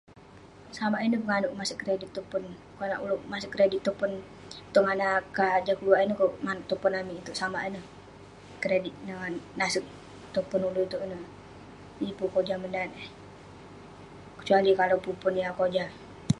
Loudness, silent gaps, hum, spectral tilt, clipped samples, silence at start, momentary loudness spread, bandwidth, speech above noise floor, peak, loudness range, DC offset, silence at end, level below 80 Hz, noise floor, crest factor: -29 LUFS; none; 50 Hz at -60 dBFS; -5 dB/octave; under 0.1%; 0.1 s; 23 LU; 11.5 kHz; 23 dB; -8 dBFS; 6 LU; under 0.1%; 0 s; -60 dBFS; -51 dBFS; 22 dB